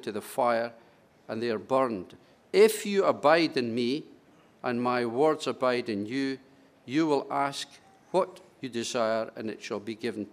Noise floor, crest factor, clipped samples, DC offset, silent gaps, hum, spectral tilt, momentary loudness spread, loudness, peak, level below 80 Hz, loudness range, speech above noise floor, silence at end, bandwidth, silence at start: -58 dBFS; 20 dB; under 0.1%; under 0.1%; none; none; -4.5 dB/octave; 14 LU; -28 LUFS; -8 dBFS; -78 dBFS; 5 LU; 31 dB; 0.05 s; 15.5 kHz; 0 s